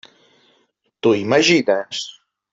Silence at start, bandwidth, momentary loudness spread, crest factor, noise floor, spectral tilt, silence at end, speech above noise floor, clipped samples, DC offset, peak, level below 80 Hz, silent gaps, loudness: 1.05 s; 7.8 kHz; 14 LU; 18 dB; -64 dBFS; -4 dB/octave; 0.4 s; 47 dB; under 0.1%; under 0.1%; -2 dBFS; -64 dBFS; none; -17 LUFS